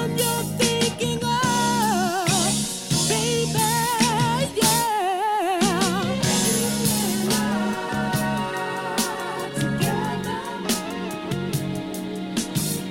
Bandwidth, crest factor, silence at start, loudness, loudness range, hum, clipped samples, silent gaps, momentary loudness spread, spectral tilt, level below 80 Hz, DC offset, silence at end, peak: 16.5 kHz; 18 dB; 0 s; -22 LUFS; 5 LU; none; under 0.1%; none; 8 LU; -3.5 dB/octave; -50 dBFS; under 0.1%; 0 s; -4 dBFS